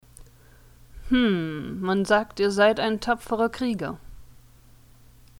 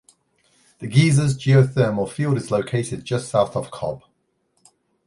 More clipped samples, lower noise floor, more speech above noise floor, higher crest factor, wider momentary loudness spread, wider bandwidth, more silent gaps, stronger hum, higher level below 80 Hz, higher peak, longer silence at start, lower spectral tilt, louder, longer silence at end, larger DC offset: neither; second, -52 dBFS vs -69 dBFS; second, 29 dB vs 49 dB; about the same, 18 dB vs 18 dB; about the same, 11 LU vs 13 LU; first, 17 kHz vs 11.5 kHz; neither; neither; about the same, -48 dBFS vs -52 dBFS; second, -8 dBFS vs -2 dBFS; second, 0.2 s vs 0.8 s; about the same, -5.5 dB/octave vs -6.5 dB/octave; second, -24 LUFS vs -20 LUFS; about the same, 1.15 s vs 1.1 s; neither